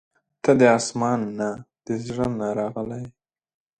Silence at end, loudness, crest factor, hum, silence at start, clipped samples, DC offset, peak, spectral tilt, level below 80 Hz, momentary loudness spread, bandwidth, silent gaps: 0.7 s; -23 LUFS; 22 dB; none; 0.45 s; under 0.1%; under 0.1%; -2 dBFS; -5.5 dB/octave; -56 dBFS; 16 LU; 10.5 kHz; none